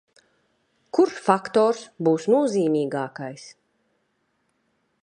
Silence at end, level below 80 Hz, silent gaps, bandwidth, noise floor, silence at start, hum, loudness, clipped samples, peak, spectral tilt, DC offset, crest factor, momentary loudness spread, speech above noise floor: 1.55 s; -74 dBFS; none; 10.5 kHz; -71 dBFS; 0.95 s; none; -22 LUFS; under 0.1%; -2 dBFS; -6 dB/octave; under 0.1%; 24 dB; 13 LU; 49 dB